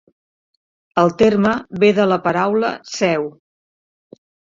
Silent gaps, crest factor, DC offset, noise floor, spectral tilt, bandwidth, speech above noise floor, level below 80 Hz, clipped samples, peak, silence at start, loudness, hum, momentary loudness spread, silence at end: none; 18 dB; under 0.1%; under -90 dBFS; -6 dB/octave; 7.6 kHz; over 74 dB; -54 dBFS; under 0.1%; 0 dBFS; 0.95 s; -17 LUFS; none; 9 LU; 1.2 s